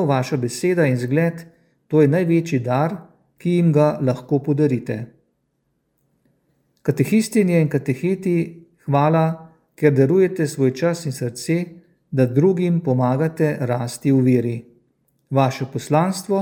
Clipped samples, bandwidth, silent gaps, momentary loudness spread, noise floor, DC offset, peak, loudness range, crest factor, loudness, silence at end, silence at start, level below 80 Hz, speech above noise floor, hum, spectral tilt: under 0.1%; 17 kHz; none; 10 LU; -70 dBFS; under 0.1%; -2 dBFS; 3 LU; 18 dB; -19 LUFS; 0 s; 0 s; -64 dBFS; 52 dB; none; -7.5 dB/octave